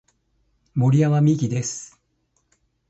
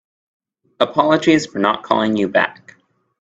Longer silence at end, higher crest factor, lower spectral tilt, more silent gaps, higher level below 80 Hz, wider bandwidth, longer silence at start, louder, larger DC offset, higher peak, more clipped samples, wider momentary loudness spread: first, 1.05 s vs 0.7 s; about the same, 16 dB vs 18 dB; first, -7 dB/octave vs -5 dB/octave; neither; about the same, -60 dBFS vs -58 dBFS; about the same, 8.2 kHz vs 8 kHz; about the same, 0.75 s vs 0.8 s; second, -20 LUFS vs -17 LUFS; neither; second, -6 dBFS vs 0 dBFS; neither; first, 15 LU vs 5 LU